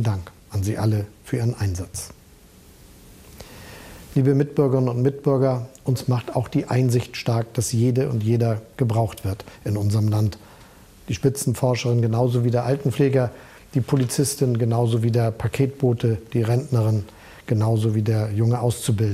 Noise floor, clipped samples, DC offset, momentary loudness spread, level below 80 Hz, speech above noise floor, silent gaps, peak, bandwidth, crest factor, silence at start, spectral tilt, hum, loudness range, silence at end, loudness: -49 dBFS; under 0.1%; under 0.1%; 10 LU; -50 dBFS; 28 dB; none; -6 dBFS; 15 kHz; 16 dB; 0 s; -7 dB/octave; none; 5 LU; 0 s; -22 LUFS